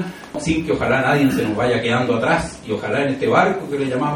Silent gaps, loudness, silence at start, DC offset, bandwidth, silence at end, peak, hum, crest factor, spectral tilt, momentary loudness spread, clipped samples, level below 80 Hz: none; -19 LUFS; 0 s; under 0.1%; 17 kHz; 0 s; -2 dBFS; none; 18 dB; -6 dB/octave; 7 LU; under 0.1%; -44 dBFS